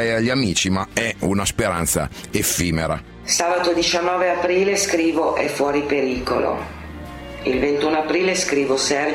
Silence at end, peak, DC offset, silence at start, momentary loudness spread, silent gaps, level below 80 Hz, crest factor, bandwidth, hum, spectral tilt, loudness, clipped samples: 0 s; -4 dBFS; under 0.1%; 0 s; 7 LU; none; -42 dBFS; 16 dB; 16.5 kHz; none; -3.5 dB/octave; -20 LUFS; under 0.1%